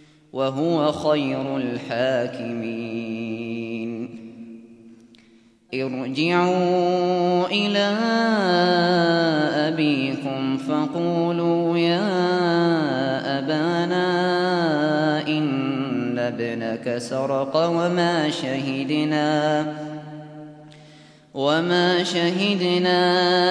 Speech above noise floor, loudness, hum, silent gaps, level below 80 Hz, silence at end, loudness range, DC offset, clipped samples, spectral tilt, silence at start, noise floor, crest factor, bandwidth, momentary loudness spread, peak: 33 dB; -22 LUFS; none; none; -68 dBFS; 0 s; 7 LU; under 0.1%; under 0.1%; -6 dB/octave; 0.35 s; -54 dBFS; 16 dB; 10.5 kHz; 10 LU; -6 dBFS